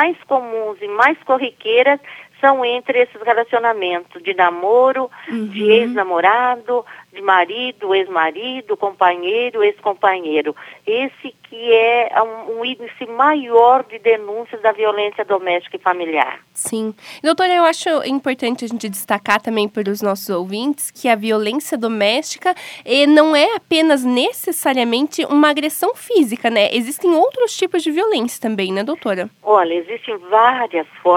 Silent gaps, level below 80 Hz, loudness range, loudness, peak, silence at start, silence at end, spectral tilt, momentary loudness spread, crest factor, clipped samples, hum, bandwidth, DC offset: none; -74 dBFS; 4 LU; -17 LUFS; 0 dBFS; 0 s; 0 s; -3.5 dB/octave; 10 LU; 16 dB; under 0.1%; none; 18 kHz; under 0.1%